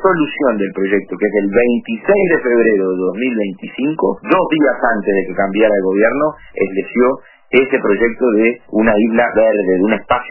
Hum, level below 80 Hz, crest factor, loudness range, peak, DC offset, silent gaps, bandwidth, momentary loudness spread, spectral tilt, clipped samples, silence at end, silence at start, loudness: none; -44 dBFS; 14 dB; 1 LU; 0 dBFS; under 0.1%; none; 3.1 kHz; 6 LU; -10 dB/octave; under 0.1%; 0 s; 0 s; -15 LUFS